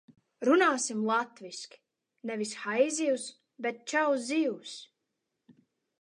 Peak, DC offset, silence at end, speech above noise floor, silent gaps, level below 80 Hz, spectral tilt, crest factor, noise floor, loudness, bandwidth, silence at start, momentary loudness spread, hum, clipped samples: -14 dBFS; under 0.1%; 1.15 s; 54 dB; none; -88 dBFS; -3 dB/octave; 18 dB; -84 dBFS; -29 LUFS; 11 kHz; 0.4 s; 18 LU; none; under 0.1%